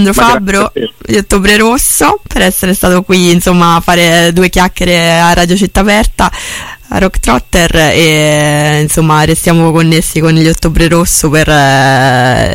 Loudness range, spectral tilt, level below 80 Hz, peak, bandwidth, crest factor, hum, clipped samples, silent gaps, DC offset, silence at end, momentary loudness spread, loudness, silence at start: 2 LU; -4.5 dB/octave; -20 dBFS; 0 dBFS; 17 kHz; 8 dB; none; 0.3%; none; under 0.1%; 0 s; 5 LU; -7 LUFS; 0 s